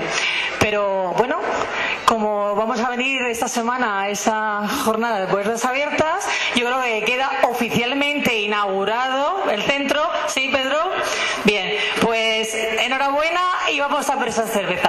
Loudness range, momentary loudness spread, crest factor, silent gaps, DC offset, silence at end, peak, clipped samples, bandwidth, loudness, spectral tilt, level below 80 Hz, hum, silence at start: 2 LU; 3 LU; 16 dB; none; under 0.1%; 0 s; -4 dBFS; under 0.1%; 15 kHz; -19 LUFS; -3 dB/octave; -52 dBFS; none; 0 s